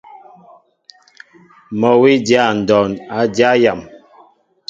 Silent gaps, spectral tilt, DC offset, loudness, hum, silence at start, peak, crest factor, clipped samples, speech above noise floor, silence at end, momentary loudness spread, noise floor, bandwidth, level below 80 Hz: none; -5.5 dB/octave; under 0.1%; -13 LUFS; none; 0.15 s; 0 dBFS; 16 dB; under 0.1%; 37 dB; 0.7 s; 8 LU; -50 dBFS; 7.8 kHz; -54 dBFS